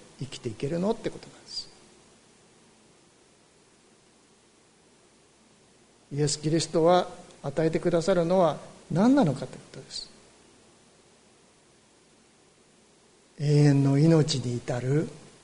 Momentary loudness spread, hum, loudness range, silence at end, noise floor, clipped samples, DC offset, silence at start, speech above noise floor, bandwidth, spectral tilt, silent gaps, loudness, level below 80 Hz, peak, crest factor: 17 LU; none; 20 LU; 0.25 s; -60 dBFS; under 0.1%; under 0.1%; 0.2 s; 35 dB; 10.5 kHz; -6.5 dB/octave; none; -26 LUFS; -58 dBFS; -10 dBFS; 18 dB